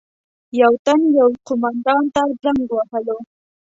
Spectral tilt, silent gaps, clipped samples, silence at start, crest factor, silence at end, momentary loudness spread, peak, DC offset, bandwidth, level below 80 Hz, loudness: -5 dB/octave; 0.79-0.85 s; under 0.1%; 0.55 s; 16 dB; 0.4 s; 10 LU; -2 dBFS; under 0.1%; 7.8 kHz; -56 dBFS; -17 LUFS